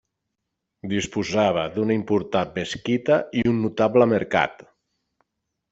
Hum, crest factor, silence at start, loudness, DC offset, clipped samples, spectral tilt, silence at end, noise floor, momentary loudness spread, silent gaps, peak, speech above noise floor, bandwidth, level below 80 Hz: none; 20 dB; 0.85 s; -22 LUFS; under 0.1%; under 0.1%; -6 dB/octave; 1.2 s; -80 dBFS; 8 LU; none; -4 dBFS; 59 dB; 8 kHz; -56 dBFS